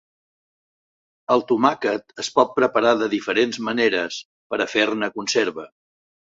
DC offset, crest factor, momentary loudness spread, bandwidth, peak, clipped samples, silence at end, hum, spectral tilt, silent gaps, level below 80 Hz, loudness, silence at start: under 0.1%; 20 dB; 9 LU; 8 kHz; -2 dBFS; under 0.1%; 0.75 s; none; -3.5 dB/octave; 4.25-4.50 s; -66 dBFS; -21 LUFS; 1.3 s